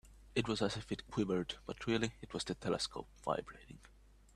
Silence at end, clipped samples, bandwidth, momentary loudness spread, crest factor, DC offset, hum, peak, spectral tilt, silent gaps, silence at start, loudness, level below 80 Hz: 0.45 s; under 0.1%; 13 kHz; 11 LU; 20 dB; under 0.1%; none; -20 dBFS; -5 dB/octave; none; 0.05 s; -39 LUFS; -60 dBFS